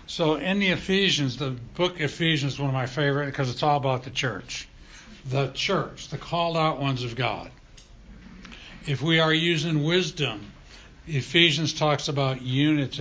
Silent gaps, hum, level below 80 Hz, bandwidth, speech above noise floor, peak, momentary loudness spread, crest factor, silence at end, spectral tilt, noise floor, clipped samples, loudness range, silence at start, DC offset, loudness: none; none; -52 dBFS; 8 kHz; 24 dB; -4 dBFS; 15 LU; 22 dB; 0 s; -5 dB/octave; -49 dBFS; under 0.1%; 4 LU; 0 s; under 0.1%; -24 LUFS